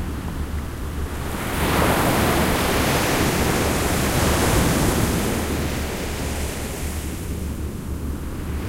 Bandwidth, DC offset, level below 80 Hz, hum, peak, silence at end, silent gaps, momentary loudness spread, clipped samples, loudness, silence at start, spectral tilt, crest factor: 16 kHz; under 0.1%; -28 dBFS; none; -6 dBFS; 0 s; none; 11 LU; under 0.1%; -22 LUFS; 0 s; -4.5 dB/octave; 16 dB